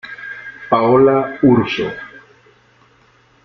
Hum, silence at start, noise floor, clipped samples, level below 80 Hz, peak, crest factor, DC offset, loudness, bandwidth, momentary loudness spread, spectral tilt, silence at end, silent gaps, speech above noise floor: none; 0.05 s; -52 dBFS; under 0.1%; -52 dBFS; -2 dBFS; 16 dB; under 0.1%; -14 LUFS; 6.4 kHz; 20 LU; -8 dB/octave; 1.35 s; none; 39 dB